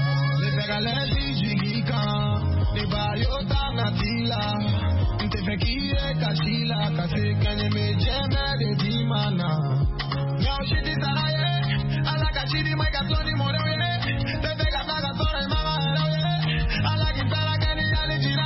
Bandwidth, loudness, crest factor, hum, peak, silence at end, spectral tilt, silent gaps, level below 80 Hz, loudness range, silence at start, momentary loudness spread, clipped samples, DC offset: 5.8 kHz; -24 LUFS; 12 dB; none; -12 dBFS; 0 s; -9.5 dB/octave; none; -32 dBFS; 1 LU; 0 s; 2 LU; under 0.1%; under 0.1%